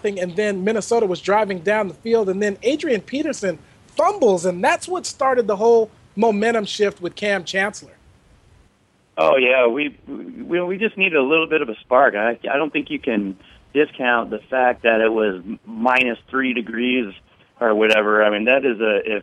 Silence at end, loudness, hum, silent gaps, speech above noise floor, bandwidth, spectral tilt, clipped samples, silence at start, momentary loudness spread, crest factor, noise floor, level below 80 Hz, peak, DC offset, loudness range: 0 s; -19 LUFS; none; none; 40 dB; 12 kHz; -4.5 dB/octave; under 0.1%; 0.05 s; 9 LU; 18 dB; -59 dBFS; -58 dBFS; -2 dBFS; under 0.1%; 3 LU